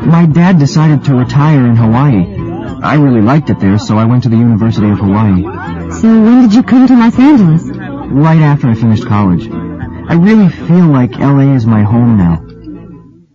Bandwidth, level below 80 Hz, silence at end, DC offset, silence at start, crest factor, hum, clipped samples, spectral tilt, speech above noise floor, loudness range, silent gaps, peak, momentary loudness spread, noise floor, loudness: 7.6 kHz; -34 dBFS; 0.4 s; under 0.1%; 0 s; 8 dB; none; 0.2%; -8.5 dB/octave; 27 dB; 2 LU; none; 0 dBFS; 13 LU; -33 dBFS; -8 LUFS